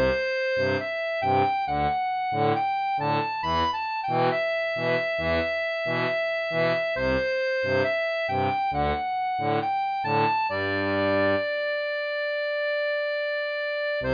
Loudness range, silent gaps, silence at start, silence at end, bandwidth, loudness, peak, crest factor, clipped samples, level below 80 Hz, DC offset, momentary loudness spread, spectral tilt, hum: 0 LU; none; 0 s; 0 s; 5.2 kHz; -25 LUFS; -12 dBFS; 14 dB; under 0.1%; -48 dBFS; under 0.1%; 4 LU; -6.5 dB/octave; none